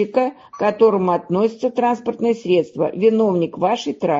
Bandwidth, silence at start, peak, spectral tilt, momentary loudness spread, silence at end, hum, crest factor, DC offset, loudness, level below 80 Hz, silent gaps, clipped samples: 7.6 kHz; 0 s; -2 dBFS; -7 dB/octave; 6 LU; 0 s; none; 16 dB; under 0.1%; -19 LUFS; -64 dBFS; none; under 0.1%